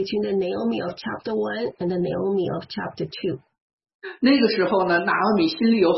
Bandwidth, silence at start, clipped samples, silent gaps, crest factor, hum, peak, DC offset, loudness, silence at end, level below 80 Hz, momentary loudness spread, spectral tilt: 6 kHz; 0 s; under 0.1%; 3.61-3.78 s, 3.94-4.00 s; 16 dB; none; -6 dBFS; under 0.1%; -23 LUFS; 0 s; -62 dBFS; 11 LU; -8 dB/octave